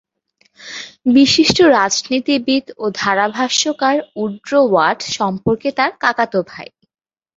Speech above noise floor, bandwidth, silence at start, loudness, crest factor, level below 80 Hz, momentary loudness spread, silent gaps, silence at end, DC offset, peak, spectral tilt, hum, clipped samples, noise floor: 45 dB; 7.8 kHz; 0.6 s; -15 LUFS; 16 dB; -52 dBFS; 13 LU; none; 0.7 s; under 0.1%; 0 dBFS; -3.5 dB/octave; none; under 0.1%; -60 dBFS